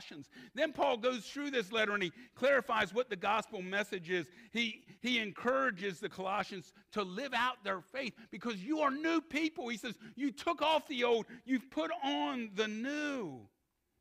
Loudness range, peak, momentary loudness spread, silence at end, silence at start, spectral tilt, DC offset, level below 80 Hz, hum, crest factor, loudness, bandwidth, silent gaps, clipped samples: 3 LU; -18 dBFS; 9 LU; 0.55 s; 0 s; -4 dB/octave; under 0.1%; -74 dBFS; none; 18 dB; -36 LUFS; 15.5 kHz; none; under 0.1%